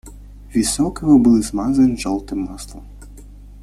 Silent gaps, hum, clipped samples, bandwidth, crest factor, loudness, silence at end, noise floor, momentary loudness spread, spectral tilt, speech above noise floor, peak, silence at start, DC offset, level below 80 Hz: none; 50 Hz at -35 dBFS; under 0.1%; 14 kHz; 16 dB; -17 LUFS; 0 s; -38 dBFS; 16 LU; -5.5 dB/octave; 22 dB; -2 dBFS; 0.05 s; under 0.1%; -36 dBFS